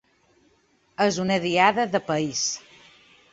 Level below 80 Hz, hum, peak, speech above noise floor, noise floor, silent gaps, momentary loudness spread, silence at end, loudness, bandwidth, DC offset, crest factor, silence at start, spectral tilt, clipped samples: -64 dBFS; none; -2 dBFS; 41 dB; -64 dBFS; none; 9 LU; 0.75 s; -23 LUFS; 8 kHz; under 0.1%; 22 dB; 1 s; -3.5 dB/octave; under 0.1%